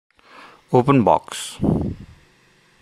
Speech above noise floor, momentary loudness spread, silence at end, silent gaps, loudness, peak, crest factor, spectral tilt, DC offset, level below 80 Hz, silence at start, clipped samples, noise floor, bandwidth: 38 dB; 14 LU; 0.75 s; none; -19 LUFS; -2 dBFS; 20 dB; -6.5 dB/octave; under 0.1%; -44 dBFS; 0.7 s; under 0.1%; -56 dBFS; 15 kHz